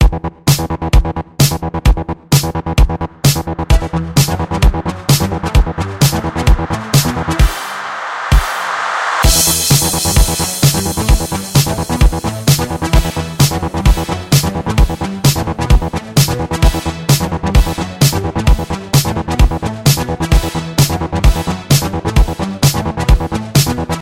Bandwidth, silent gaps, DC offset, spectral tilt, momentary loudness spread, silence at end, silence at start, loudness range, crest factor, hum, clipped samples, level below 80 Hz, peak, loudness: 17 kHz; none; under 0.1%; -4.5 dB/octave; 4 LU; 0 s; 0 s; 2 LU; 12 dB; none; under 0.1%; -18 dBFS; 0 dBFS; -14 LUFS